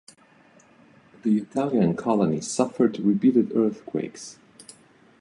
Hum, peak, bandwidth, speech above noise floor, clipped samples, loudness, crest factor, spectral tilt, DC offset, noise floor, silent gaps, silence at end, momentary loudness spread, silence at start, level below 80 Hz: none; -6 dBFS; 11.5 kHz; 33 dB; under 0.1%; -24 LUFS; 18 dB; -6.5 dB/octave; under 0.1%; -56 dBFS; none; 0.9 s; 11 LU; 1.25 s; -64 dBFS